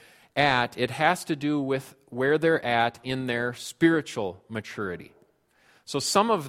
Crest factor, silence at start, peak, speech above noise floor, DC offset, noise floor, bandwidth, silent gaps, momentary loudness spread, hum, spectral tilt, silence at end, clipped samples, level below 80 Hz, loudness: 20 dB; 0.35 s; -6 dBFS; 37 dB; under 0.1%; -63 dBFS; 16 kHz; none; 11 LU; none; -4.5 dB/octave; 0 s; under 0.1%; -62 dBFS; -26 LUFS